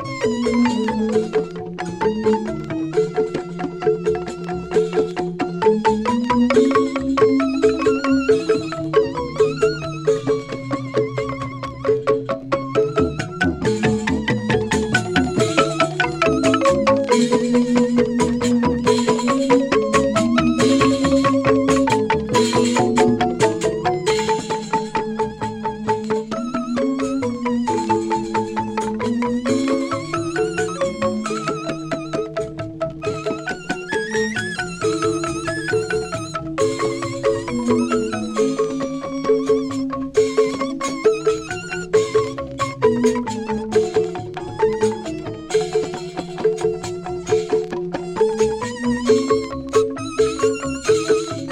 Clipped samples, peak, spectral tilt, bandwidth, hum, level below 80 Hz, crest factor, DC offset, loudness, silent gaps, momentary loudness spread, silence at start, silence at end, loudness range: under 0.1%; -2 dBFS; -5 dB/octave; 11.5 kHz; none; -44 dBFS; 16 dB; under 0.1%; -20 LUFS; none; 9 LU; 0 s; 0 s; 6 LU